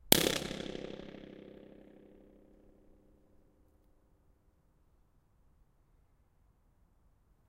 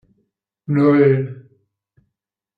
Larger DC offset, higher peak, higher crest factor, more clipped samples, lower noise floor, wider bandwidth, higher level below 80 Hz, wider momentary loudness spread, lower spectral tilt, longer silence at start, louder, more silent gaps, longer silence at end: neither; first, 0 dBFS vs -4 dBFS; first, 40 dB vs 16 dB; neither; second, -69 dBFS vs -79 dBFS; first, 16 kHz vs 4.8 kHz; about the same, -62 dBFS vs -64 dBFS; first, 29 LU vs 18 LU; second, -2.5 dB/octave vs -11 dB/octave; second, 0.05 s vs 0.7 s; second, -32 LUFS vs -16 LUFS; neither; first, 6 s vs 1.2 s